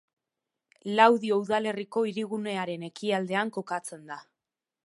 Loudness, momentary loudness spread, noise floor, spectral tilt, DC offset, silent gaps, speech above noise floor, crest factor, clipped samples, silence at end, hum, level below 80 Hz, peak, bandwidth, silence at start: -27 LUFS; 20 LU; -89 dBFS; -5 dB/octave; under 0.1%; none; 62 dB; 24 dB; under 0.1%; 0.65 s; none; -80 dBFS; -4 dBFS; 11.5 kHz; 0.85 s